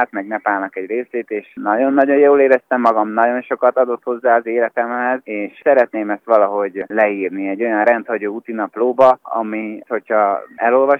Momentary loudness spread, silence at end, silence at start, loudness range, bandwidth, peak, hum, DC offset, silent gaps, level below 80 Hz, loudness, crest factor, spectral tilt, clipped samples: 11 LU; 0 s; 0 s; 3 LU; 5.6 kHz; 0 dBFS; none; under 0.1%; none; -70 dBFS; -17 LUFS; 16 dB; -7.5 dB/octave; under 0.1%